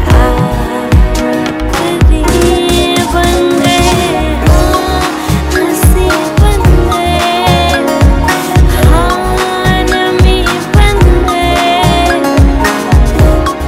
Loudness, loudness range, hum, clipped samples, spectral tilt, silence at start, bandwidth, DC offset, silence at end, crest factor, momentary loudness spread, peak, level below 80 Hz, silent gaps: -9 LUFS; 1 LU; none; 1%; -5.5 dB/octave; 0 s; 16.5 kHz; under 0.1%; 0 s; 8 dB; 4 LU; 0 dBFS; -12 dBFS; none